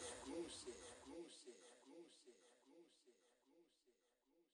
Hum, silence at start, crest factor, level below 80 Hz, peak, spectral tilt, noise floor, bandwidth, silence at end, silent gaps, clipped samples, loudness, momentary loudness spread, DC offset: none; 0 s; 20 dB; -82 dBFS; -40 dBFS; -2.5 dB/octave; -83 dBFS; 12 kHz; 0.1 s; none; under 0.1%; -57 LUFS; 14 LU; under 0.1%